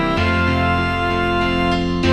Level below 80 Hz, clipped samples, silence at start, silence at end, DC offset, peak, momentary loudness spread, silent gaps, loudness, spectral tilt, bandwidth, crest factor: -30 dBFS; under 0.1%; 0 s; 0 s; under 0.1%; -4 dBFS; 2 LU; none; -18 LUFS; -6.5 dB/octave; 12 kHz; 14 dB